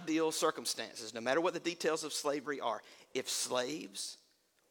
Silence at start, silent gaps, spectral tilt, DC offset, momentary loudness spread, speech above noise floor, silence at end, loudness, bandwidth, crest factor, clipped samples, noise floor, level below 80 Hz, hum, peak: 0 s; none; -2 dB/octave; under 0.1%; 10 LU; 36 dB; 0.55 s; -36 LUFS; 18 kHz; 18 dB; under 0.1%; -72 dBFS; -86 dBFS; none; -18 dBFS